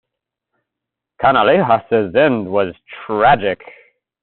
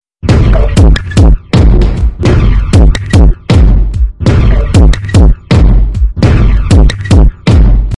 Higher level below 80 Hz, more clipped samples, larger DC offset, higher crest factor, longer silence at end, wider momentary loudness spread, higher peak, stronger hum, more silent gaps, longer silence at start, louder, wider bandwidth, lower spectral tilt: second, -50 dBFS vs -8 dBFS; second, under 0.1% vs 2%; neither; first, 16 dB vs 6 dB; first, 0.65 s vs 0 s; first, 11 LU vs 3 LU; about the same, -2 dBFS vs 0 dBFS; neither; neither; first, 1.2 s vs 0.25 s; second, -15 LUFS vs -8 LUFS; second, 4.3 kHz vs 11 kHz; second, -3.5 dB/octave vs -7 dB/octave